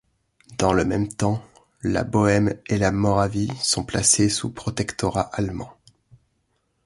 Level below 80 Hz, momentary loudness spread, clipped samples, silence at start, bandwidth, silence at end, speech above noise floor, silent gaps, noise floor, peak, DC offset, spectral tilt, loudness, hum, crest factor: -44 dBFS; 11 LU; under 0.1%; 0.5 s; 11.5 kHz; 1.15 s; 48 dB; none; -70 dBFS; -4 dBFS; under 0.1%; -4.5 dB/octave; -22 LUFS; none; 20 dB